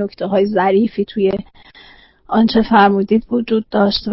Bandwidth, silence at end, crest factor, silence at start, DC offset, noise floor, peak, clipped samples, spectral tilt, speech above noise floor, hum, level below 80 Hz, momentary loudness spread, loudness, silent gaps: 5.8 kHz; 0 s; 14 dB; 0 s; under 0.1%; -45 dBFS; -2 dBFS; under 0.1%; -10.5 dB/octave; 30 dB; none; -46 dBFS; 7 LU; -15 LUFS; none